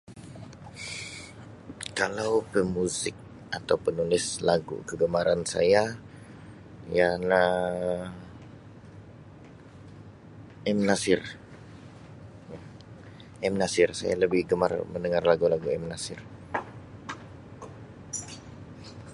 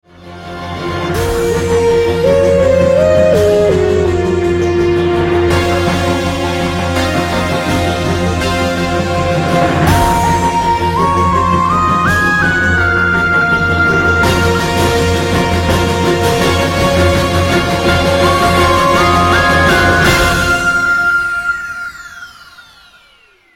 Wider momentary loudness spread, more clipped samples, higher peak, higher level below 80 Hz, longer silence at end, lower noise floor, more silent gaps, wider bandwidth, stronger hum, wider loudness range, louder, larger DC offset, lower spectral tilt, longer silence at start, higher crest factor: first, 24 LU vs 6 LU; neither; second, -6 dBFS vs 0 dBFS; second, -56 dBFS vs -28 dBFS; second, 0 s vs 0.95 s; about the same, -48 dBFS vs -48 dBFS; neither; second, 11.5 kHz vs 16.5 kHz; neither; about the same, 5 LU vs 4 LU; second, -27 LUFS vs -12 LUFS; neither; about the same, -4.5 dB/octave vs -5 dB/octave; about the same, 0.1 s vs 0.2 s; first, 24 dB vs 12 dB